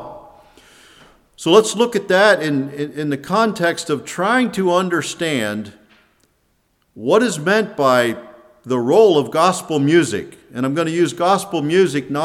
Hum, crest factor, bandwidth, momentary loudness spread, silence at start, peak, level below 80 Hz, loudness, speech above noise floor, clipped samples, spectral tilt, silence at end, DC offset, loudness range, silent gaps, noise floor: none; 18 dB; 15.5 kHz; 11 LU; 0 s; 0 dBFS; -62 dBFS; -17 LUFS; 47 dB; under 0.1%; -4.5 dB/octave; 0 s; under 0.1%; 4 LU; none; -63 dBFS